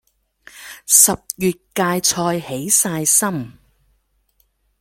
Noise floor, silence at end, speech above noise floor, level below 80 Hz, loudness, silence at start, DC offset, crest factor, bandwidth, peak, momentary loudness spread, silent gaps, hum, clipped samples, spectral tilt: -64 dBFS; 1.3 s; 46 dB; -54 dBFS; -15 LUFS; 0.55 s; under 0.1%; 20 dB; 17 kHz; 0 dBFS; 18 LU; none; none; under 0.1%; -2.5 dB/octave